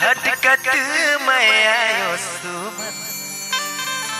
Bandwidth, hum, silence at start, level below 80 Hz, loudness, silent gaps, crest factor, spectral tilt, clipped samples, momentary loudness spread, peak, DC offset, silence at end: 16 kHz; none; 0 s; -66 dBFS; -17 LUFS; none; 18 dB; -0.5 dB/octave; under 0.1%; 13 LU; -2 dBFS; under 0.1%; 0 s